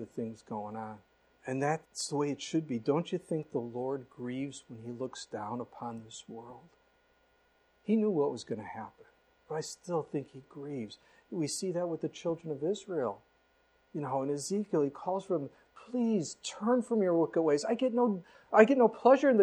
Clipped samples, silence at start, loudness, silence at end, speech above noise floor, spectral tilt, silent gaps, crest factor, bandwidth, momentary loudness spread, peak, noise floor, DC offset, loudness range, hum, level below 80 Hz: under 0.1%; 0 s; -33 LUFS; 0 s; 38 dB; -5.5 dB/octave; none; 24 dB; 12.5 kHz; 17 LU; -8 dBFS; -70 dBFS; under 0.1%; 9 LU; none; -76 dBFS